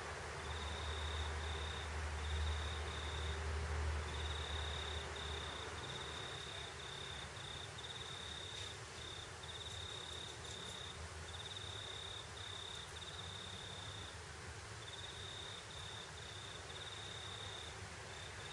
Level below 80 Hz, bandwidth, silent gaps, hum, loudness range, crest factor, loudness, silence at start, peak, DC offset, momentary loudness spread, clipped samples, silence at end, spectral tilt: -52 dBFS; 11.5 kHz; none; none; 5 LU; 16 dB; -46 LUFS; 0 s; -30 dBFS; under 0.1%; 6 LU; under 0.1%; 0 s; -3 dB/octave